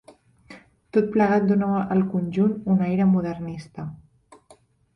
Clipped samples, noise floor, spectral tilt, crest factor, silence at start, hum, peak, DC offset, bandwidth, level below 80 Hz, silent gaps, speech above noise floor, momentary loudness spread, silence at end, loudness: under 0.1%; -56 dBFS; -9.5 dB/octave; 16 dB; 0.5 s; none; -8 dBFS; under 0.1%; 6 kHz; -56 dBFS; none; 35 dB; 15 LU; 1 s; -22 LUFS